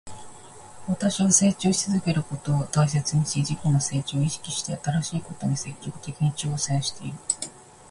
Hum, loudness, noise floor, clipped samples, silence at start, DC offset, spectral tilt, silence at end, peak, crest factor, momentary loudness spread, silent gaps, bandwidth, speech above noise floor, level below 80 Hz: none; -25 LUFS; -44 dBFS; under 0.1%; 0.05 s; under 0.1%; -4.5 dB/octave; 0 s; -4 dBFS; 20 dB; 15 LU; none; 11.5 kHz; 20 dB; -54 dBFS